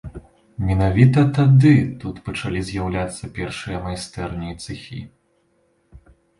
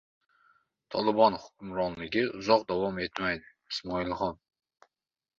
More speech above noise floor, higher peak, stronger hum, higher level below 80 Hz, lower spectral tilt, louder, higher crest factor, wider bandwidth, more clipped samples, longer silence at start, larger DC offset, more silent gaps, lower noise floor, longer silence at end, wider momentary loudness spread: second, 45 dB vs over 61 dB; first, -2 dBFS vs -8 dBFS; neither; first, -38 dBFS vs -60 dBFS; first, -7.5 dB/octave vs -5.5 dB/octave; first, -19 LUFS vs -30 LUFS; about the same, 18 dB vs 22 dB; first, 11.5 kHz vs 7.4 kHz; neither; second, 0.05 s vs 0.9 s; neither; neither; second, -64 dBFS vs under -90 dBFS; second, 0.4 s vs 1.05 s; first, 19 LU vs 12 LU